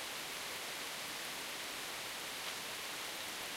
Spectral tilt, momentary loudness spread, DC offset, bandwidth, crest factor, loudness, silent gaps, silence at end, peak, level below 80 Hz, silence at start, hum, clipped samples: 0 dB/octave; 0 LU; under 0.1%; 16 kHz; 16 dB; -41 LUFS; none; 0 s; -28 dBFS; -74 dBFS; 0 s; none; under 0.1%